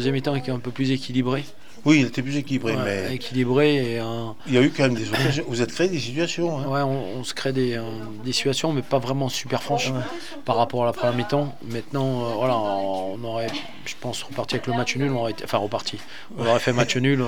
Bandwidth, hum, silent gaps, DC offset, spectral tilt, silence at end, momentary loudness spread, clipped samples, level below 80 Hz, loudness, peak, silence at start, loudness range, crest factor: 17.5 kHz; none; none; 2%; -5.5 dB/octave; 0 s; 10 LU; under 0.1%; -58 dBFS; -24 LUFS; -4 dBFS; 0 s; 4 LU; 20 dB